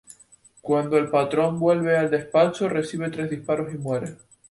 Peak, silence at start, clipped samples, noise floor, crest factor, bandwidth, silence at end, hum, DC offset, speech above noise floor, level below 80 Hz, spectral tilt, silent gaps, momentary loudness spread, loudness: -6 dBFS; 0.65 s; under 0.1%; -54 dBFS; 18 dB; 11.5 kHz; 0.35 s; none; under 0.1%; 32 dB; -62 dBFS; -6.5 dB/octave; none; 9 LU; -23 LUFS